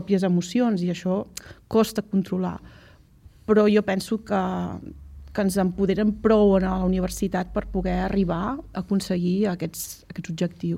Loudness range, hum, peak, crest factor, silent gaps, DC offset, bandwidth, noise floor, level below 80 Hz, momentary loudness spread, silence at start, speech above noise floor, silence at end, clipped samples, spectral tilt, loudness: 3 LU; none; -6 dBFS; 18 dB; none; under 0.1%; 16 kHz; -51 dBFS; -42 dBFS; 14 LU; 0 s; 28 dB; 0 s; under 0.1%; -6.5 dB/octave; -24 LUFS